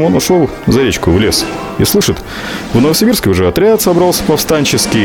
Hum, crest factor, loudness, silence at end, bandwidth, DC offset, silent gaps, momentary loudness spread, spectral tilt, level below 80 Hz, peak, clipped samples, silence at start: none; 10 dB; -11 LUFS; 0 s; 19 kHz; under 0.1%; none; 6 LU; -4.5 dB/octave; -32 dBFS; 0 dBFS; under 0.1%; 0 s